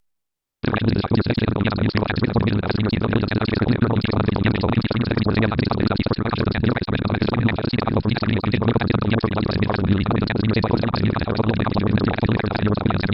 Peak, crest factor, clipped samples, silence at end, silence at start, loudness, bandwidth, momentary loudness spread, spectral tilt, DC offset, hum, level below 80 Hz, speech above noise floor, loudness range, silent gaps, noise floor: -4 dBFS; 16 dB; under 0.1%; 0 s; 0.65 s; -21 LUFS; 5.8 kHz; 2 LU; -11 dB/octave; under 0.1%; none; -38 dBFS; 61 dB; 1 LU; none; -81 dBFS